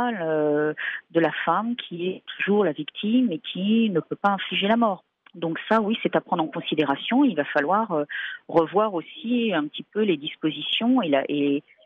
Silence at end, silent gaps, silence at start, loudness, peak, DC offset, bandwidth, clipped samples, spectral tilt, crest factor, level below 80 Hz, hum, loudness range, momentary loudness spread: 0.25 s; none; 0 s; -24 LUFS; -8 dBFS; under 0.1%; 5.2 kHz; under 0.1%; -8 dB/octave; 16 dB; -72 dBFS; none; 1 LU; 9 LU